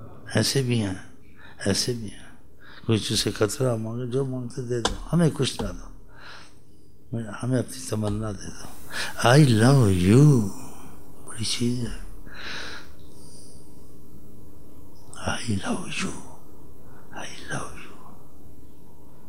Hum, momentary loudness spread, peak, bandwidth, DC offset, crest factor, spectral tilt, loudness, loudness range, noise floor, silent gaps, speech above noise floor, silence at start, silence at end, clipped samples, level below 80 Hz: none; 25 LU; -2 dBFS; 16 kHz; 3%; 24 dB; -5.5 dB/octave; -24 LUFS; 15 LU; -54 dBFS; none; 32 dB; 0 s; 0 s; under 0.1%; -48 dBFS